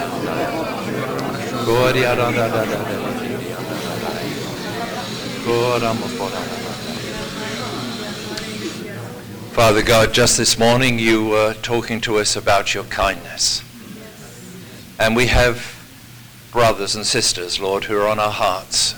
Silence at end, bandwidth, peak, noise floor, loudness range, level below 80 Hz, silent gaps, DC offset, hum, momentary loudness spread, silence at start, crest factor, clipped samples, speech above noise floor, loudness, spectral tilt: 0 s; over 20 kHz; -6 dBFS; -40 dBFS; 7 LU; -36 dBFS; none; under 0.1%; none; 16 LU; 0 s; 14 dB; under 0.1%; 23 dB; -19 LUFS; -3.5 dB/octave